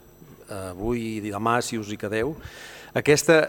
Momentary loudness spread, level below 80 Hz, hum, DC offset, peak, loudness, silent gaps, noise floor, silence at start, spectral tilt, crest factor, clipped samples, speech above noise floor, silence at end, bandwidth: 18 LU; -50 dBFS; none; under 0.1%; -2 dBFS; -25 LUFS; none; -48 dBFS; 0.2 s; -4.5 dB/octave; 22 dB; under 0.1%; 24 dB; 0 s; 19.5 kHz